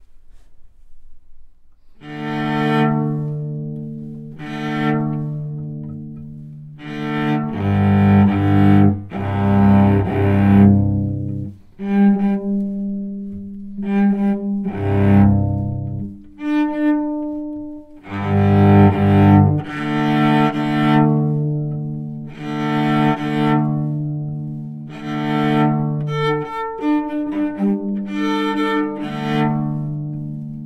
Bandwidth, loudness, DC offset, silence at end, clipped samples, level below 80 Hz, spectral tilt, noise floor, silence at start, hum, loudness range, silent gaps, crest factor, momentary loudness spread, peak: 6.2 kHz; -18 LUFS; under 0.1%; 0 s; under 0.1%; -44 dBFS; -9 dB/octave; -43 dBFS; 0 s; none; 8 LU; none; 18 dB; 17 LU; 0 dBFS